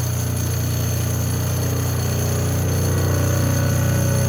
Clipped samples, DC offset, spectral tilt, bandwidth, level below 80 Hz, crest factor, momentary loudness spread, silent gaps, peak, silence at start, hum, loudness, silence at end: under 0.1%; under 0.1%; -5.5 dB/octave; 18 kHz; -42 dBFS; 12 dB; 3 LU; none; -8 dBFS; 0 s; none; -20 LUFS; 0 s